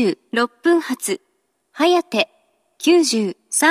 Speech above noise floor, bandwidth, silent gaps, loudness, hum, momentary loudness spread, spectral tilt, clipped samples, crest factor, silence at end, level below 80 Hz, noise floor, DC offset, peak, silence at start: 48 dB; 14.5 kHz; none; -19 LUFS; none; 9 LU; -2.5 dB/octave; under 0.1%; 18 dB; 0 s; -80 dBFS; -65 dBFS; under 0.1%; -2 dBFS; 0 s